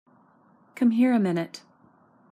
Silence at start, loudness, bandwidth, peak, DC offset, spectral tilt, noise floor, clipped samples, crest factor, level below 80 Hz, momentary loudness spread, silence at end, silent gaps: 0.75 s; -23 LUFS; 10 kHz; -12 dBFS; under 0.1%; -7.5 dB/octave; -59 dBFS; under 0.1%; 14 dB; -78 dBFS; 16 LU; 0.75 s; none